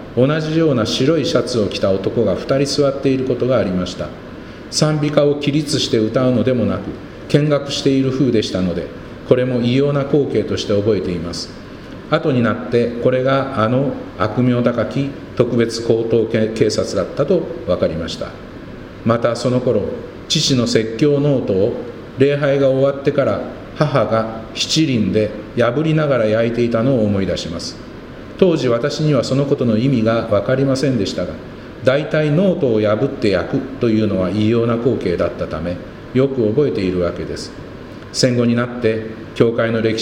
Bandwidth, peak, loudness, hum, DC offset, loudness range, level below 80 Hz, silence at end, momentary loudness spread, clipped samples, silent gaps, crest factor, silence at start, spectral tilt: 15.5 kHz; 0 dBFS; -17 LUFS; none; under 0.1%; 2 LU; -44 dBFS; 0 s; 11 LU; under 0.1%; none; 16 dB; 0 s; -6 dB/octave